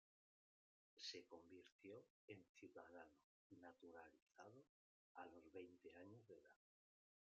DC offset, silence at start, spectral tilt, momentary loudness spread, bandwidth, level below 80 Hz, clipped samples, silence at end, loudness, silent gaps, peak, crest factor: under 0.1%; 0.95 s; -2.5 dB/octave; 11 LU; 7.2 kHz; under -90 dBFS; under 0.1%; 0.8 s; -63 LUFS; 1.72-1.79 s, 2.10-2.28 s, 2.49-2.55 s, 3.24-3.50 s, 4.22-4.26 s, 4.69-5.15 s; -42 dBFS; 22 dB